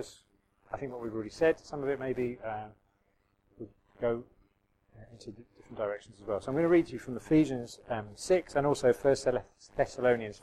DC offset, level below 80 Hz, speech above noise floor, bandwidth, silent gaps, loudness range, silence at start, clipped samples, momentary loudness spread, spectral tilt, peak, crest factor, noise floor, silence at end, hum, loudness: under 0.1%; -58 dBFS; 42 dB; 13 kHz; none; 11 LU; 0 s; under 0.1%; 22 LU; -6 dB/octave; -14 dBFS; 18 dB; -73 dBFS; 0.05 s; none; -31 LUFS